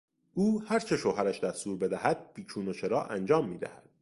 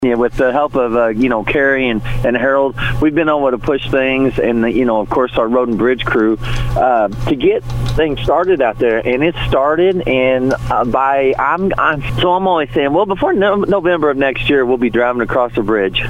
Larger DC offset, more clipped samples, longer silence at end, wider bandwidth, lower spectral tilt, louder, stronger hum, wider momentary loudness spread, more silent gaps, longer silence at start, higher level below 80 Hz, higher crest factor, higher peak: neither; neither; first, 0.25 s vs 0 s; second, 11.5 kHz vs 15 kHz; about the same, -6 dB/octave vs -7 dB/octave; second, -31 LUFS vs -14 LUFS; neither; first, 10 LU vs 3 LU; neither; first, 0.35 s vs 0 s; second, -66 dBFS vs -30 dBFS; first, 20 dB vs 12 dB; second, -12 dBFS vs 0 dBFS